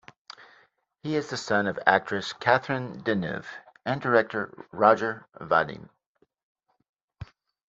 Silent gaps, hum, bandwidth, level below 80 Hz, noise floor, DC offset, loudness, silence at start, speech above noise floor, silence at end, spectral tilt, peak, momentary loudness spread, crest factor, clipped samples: 6.06-6.15 s, 6.43-6.55 s, 6.89-6.93 s, 7.04-7.08 s; none; 8 kHz; -64 dBFS; -70 dBFS; under 0.1%; -26 LUFS; 0.4 s; 44 dB; 0.45 s; -5.5 dB/octave; -2 dBFS; 24 LU; 26 dB; under 0.1%